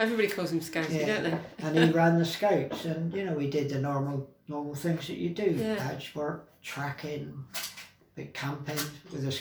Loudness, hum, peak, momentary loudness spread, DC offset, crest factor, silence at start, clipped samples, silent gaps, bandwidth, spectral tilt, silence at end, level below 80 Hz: -31 LUFS; none; -10 dBFS; 13 LU; under 0.1%; 20 dB; 0 s; under 0.1%; none; over 20 kHz; -5.5 dB/octave; 0 s; -68 dBFS